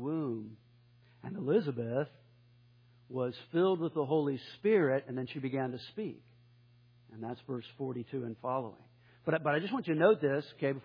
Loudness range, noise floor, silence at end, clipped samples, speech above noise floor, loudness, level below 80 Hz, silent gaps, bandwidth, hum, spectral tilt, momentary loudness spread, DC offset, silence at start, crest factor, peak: 8 LU; -63 dBFS; 0.05 s; under 0.1%; 30 dB; -34 LUFS; -80 dBFS; none; 5.2 kHz; none; -6 dB/octave; 14 LU; under 0.1%; 0 s; 20 dB; -14 dBFS